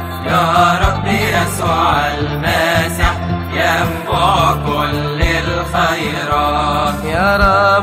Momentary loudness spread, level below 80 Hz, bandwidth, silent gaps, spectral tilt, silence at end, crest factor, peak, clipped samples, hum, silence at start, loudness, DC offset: 6 LU; -26 dBFS; 16 kHz; none; -5 dB/octave; 0 s; 14 dB; 0 dBFS; under 0.1%; none; 0 s; -14 LUFS; under 0.1%